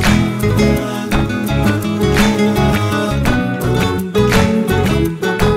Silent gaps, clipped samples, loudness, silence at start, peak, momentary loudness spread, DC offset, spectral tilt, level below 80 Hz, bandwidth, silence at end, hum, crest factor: none; under 0.1%; -15 LUFS; 0 s; 0 dBFS; 4 LU; under 0.1%; -6 dB/octave; -24 dBFS; 16 kHz; 0 s; none; 14 dB